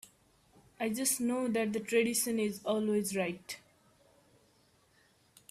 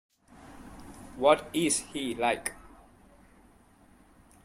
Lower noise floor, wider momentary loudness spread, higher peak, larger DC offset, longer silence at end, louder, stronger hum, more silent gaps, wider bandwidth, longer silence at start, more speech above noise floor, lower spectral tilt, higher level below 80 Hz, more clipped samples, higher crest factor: first, -68 dBFS vs -59 dBFS; second, 9 LU vs 24 LU; second, -18 dBFS vs -8 dBFS; neither; about the same, 1.9 s vs 1.8 s; second, -32 LUFS vs -28 LUFS; neither; neither; about the same, 15.5 kHz vs 16 kHz; first, 0.8 s vs 0.4 s; first, 36 dB vs 32 dB; about the same, -3.5 dB/octave vs -3 dB/octave; second, -74 dBFS vs -58 dBFS; neither; second, 18 dB vs 26 dB